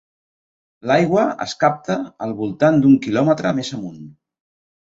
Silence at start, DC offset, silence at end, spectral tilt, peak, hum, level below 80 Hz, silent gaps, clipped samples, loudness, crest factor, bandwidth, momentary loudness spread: 0.85 s; under 0.1%; 0.85 s; -6.5 dB/octave; -2 dBFS; none; -58 dBFS; none; under 0.1%; -18 LUFS; 16 dB; 7.8 kHz; 13 LU